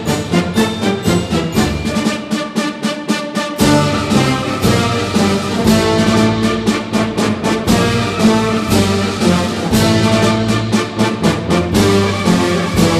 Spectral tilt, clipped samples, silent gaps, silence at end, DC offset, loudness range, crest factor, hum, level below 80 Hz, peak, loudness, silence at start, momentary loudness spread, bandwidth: -5 dB/octave; under 0.1%; none; 0 s; under 0.1%; 3 LU; 14 dB; none; -34 dBFS; 0 dBFS; -14 LUFS; 0 s; 6 LU; 15.5 kHz